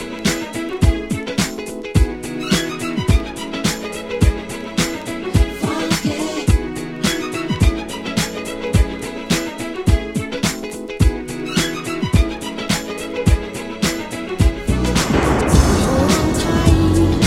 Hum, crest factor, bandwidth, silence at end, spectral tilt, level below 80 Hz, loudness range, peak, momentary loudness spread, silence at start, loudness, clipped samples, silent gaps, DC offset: none; 18 dB; 16.5 kHz; 0 s; -5 dB/octave; -24 dBFS; 4 LU; 0 dBFS; 10 LU; 0 s; -19 LUFS; under 0.1%; none; under 0.1%